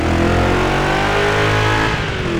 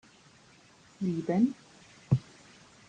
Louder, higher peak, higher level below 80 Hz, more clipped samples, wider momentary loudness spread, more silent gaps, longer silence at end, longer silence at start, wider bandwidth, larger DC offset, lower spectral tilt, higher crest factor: first, -15 LUFS vs -31 LUFS; first, -2 dBFS vs -10 dBFS; first, -26 dBFS vs -64 dBFS; neither; second, 2 LU vs 17 LU; neither; second, 0 s vs 0.65 s; second, 0 s vs 1 s; first, over 20 kHz vs 9.4 kHz; neither; second, -5.5 dB/octave vs -8.5 dB/octave; second, 12 dB vs 22 dB